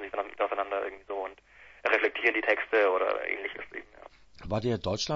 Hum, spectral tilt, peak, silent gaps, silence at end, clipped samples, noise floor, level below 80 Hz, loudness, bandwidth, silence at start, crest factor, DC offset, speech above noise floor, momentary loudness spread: none; -4.5 dB/octave; -8 dBFS; none; 0 s; under 0.1%; -55 dBFS; -58 dBFS; -29 LUFS; 7.8 kHz; 0 s; 22 dB; under 0.1%; 27 dB; 15 LU